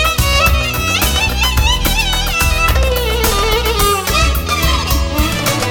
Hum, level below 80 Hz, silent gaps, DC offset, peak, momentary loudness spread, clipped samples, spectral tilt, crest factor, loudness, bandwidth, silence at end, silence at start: none; -18 dBFS; none; under 0.1%; -2 dBFS; 3 LU; under 0.1%; -3 dB/octave; 12 dB; -13 LUFS; over 20 kHz; 0 s; 0 s